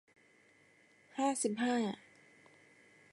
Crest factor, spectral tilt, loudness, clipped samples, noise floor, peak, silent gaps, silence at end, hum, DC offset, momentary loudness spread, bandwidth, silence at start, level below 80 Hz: 18 dB; -3.5 dB/octave; -36 LUFS; under 0.1%; -67 dBFS; -22 dBFS; none; 1.15 s; none; under 0.1%; 14 LU; 11.5 kHz; 1.15 s; -88 dBFS